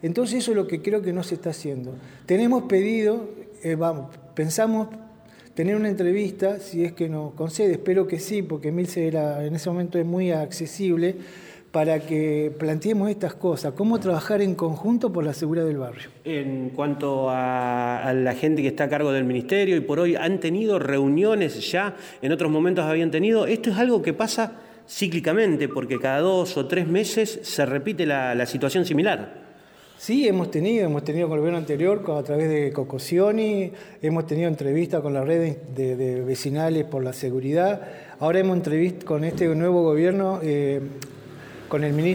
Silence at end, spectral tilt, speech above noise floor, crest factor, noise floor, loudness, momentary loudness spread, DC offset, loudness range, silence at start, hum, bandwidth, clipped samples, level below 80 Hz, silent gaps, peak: 0 s; -6 dB/octave; 27 dB; 14 dB; -50 dBFS; -24 LUFS; 9 LU; under 0.1%; 3 LU; 0.05 s; none; 19.5 kHz; under 0.1%; -66 dBFS; none; -10 dBFS